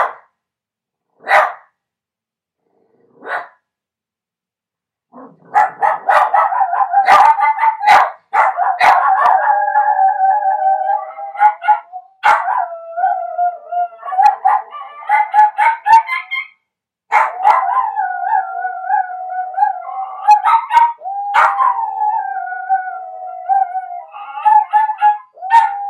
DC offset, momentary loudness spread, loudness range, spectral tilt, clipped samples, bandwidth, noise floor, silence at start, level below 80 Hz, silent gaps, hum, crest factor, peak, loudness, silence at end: under 0.1%; 13 LU; 10 LU; -1 dB/octave; under 0.1%; 12.5 kHz; -87 dBFS; 0 s; -66 dBFS; none; none; 16 dB; 0 dBFS; -14 LUFS; 0 s